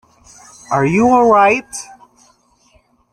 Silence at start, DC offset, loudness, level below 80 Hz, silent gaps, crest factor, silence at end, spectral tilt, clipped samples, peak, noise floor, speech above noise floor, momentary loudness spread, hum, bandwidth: 0.7 s; under 0.1%; -13 LUFS; -50 dBFS; none; 16 dB; 1.3 s; -6 dB/octave; under 0.1%; -2 dBFS; -55 dBFS; 43 dB; 19 LU; none; 13 kHz